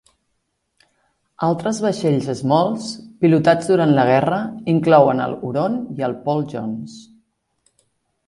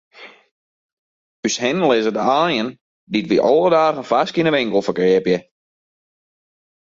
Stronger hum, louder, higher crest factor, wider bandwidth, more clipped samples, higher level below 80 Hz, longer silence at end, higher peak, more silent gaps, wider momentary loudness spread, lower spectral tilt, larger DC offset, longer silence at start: neither; about the same, -18 LUFS vs -17 LUFS; about the same, 18 dB vs 18 dB; first, 11.5 kHz vs 7.6 kHz; neither; about the same, -60 dBFS vs -60 dBFS; second, 1.25 s vs 1.55 s; about the same, 0 dBFS vs -2 dBFS; second, none vs 0.51-1.43 s, 2.81-3.07 s; first, 12 LU vs 9 LU; first, -7 dB/octave vs -4.5 dB/octave; neither; first, 1.4 s vs 0.2 s